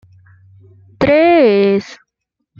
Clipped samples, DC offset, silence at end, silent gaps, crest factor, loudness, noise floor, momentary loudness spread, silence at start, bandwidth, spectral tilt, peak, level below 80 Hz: under 0.1%; under 0.1%; 0.65 s; none; 14 dB; -12 LUFS; -74 dBFS; 9 LU; 1 s; 7.2 kHz; -7 dB/octave; -2 dBFS; -48 dBFS